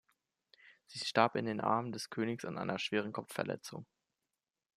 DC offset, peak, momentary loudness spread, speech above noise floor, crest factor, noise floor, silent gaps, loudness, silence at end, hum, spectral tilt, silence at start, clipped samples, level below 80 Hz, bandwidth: under 0.1%; -12 dBFS; 13 LU; over 54 dB; 26 dB; under -90 dBFS; none; -36 LUFS; 0.9 s; none; -5 dB/octave; 0.65 s; under 0.1%; -80 dBFS; 15 kHz